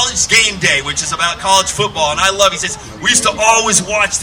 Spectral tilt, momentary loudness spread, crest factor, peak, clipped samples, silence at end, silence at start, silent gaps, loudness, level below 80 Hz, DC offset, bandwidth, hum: -1 dB/octave; 7 LU; 14 dB; 0 dBFS; 0.1%; 0 s; 0 s; none; -12 LUFS; -38 dBFS; under 0.1%; over 20 kHz; none